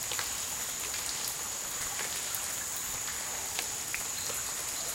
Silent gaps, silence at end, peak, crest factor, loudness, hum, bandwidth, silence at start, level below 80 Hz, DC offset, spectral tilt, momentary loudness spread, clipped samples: none; 0 s; -10 dBFS; 24 dB; -33 LUFS; none; 17 kHz; 0 s; -60 dBFS; under 0.1%; 0.5 dB/octave; 1 LU; under 0.1%